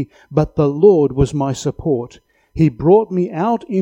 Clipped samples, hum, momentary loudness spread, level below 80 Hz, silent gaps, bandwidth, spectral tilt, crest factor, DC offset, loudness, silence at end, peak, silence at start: under 0.1%; none; 9 LU; -36 dBFS; none; 10 kHz; -8 dB/octave; 16 dB; under 0.1%; -16 LUFS; 0 s; 0 dBFS; 0 s